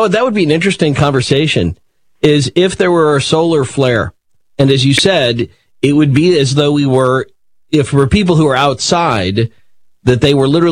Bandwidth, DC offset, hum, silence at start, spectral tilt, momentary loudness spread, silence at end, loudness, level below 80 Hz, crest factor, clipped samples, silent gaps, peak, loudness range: 10.5 kHz; 0.3%; none; 0 s; -5.5 dB/octave; 7 LU; 0 s; -12 LUFS; -38 dBFS; 12 dB; 0.2%; none; 0 dBFS; 1 LU